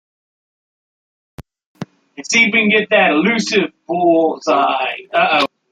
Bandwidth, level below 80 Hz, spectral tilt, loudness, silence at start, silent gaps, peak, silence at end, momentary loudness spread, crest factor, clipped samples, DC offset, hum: 10.5 kHz; -58 dBFS; -4 dB/octave; -14 LUFS; 1.4 s; 1.66-1.75 s; -2 dBFS; 0.25 s; 21 LU; 16 dB; under 0.1%; under 0.1%; none